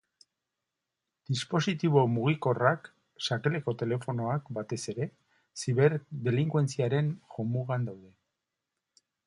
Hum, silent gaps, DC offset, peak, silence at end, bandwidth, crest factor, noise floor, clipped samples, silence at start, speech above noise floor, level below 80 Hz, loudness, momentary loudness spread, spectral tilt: none; none; under 0.1%; -10 dBFS; 1.2 s; 11 kHz; 22 dB; -87 dBFS; under 0.1%; 1.3 s; 58 dB; -70 dBFS; -30 LUFS; 11 LU; -6.5 dB/octave